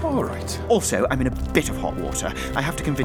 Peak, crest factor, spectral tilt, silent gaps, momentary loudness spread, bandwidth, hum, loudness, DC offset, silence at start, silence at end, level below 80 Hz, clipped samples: -4 dBFS; 20 dB; -4.5 dB/octave; none; 6 LU; over 20 kHz; none; -23 LUFS; under 0.1%; 0 s; 0 s; -34 dBFS; under 0.1%